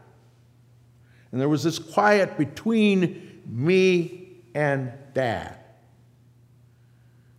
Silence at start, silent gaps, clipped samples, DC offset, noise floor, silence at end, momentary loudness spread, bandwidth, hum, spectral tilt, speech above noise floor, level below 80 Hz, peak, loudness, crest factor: 1.35 s; none; under 0.1%; under 0.1%; -56 dBFS; 1.85 s; 15 LU; 15 kHz; none; -6 dB/octave; 33 dB; -68 dBFS; -4 dBFS; -23 LUFS; 20 dB